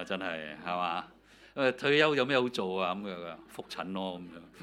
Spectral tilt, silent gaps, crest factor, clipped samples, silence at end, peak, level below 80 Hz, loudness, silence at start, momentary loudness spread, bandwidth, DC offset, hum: -5 dB/octave; none; 22 dB; under 0.1%; 0 s; -10 dBFS; -70 dBFS; -31 LUFS; 0 s; 19 LU; 14 kHz; under 0.1%; none